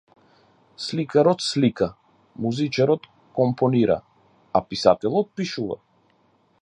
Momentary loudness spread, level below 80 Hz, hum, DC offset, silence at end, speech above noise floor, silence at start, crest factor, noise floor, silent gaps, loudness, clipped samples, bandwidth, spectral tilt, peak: 10 LU; -58 dBFS; none; under 0.1%; 0.85 s; 41 dB; 0.8 s; 22 dB; -62 dBFS; none; -23 LUFS; under 0.1%; 10.5 kHz; -6 dB/octave; -2 dBFS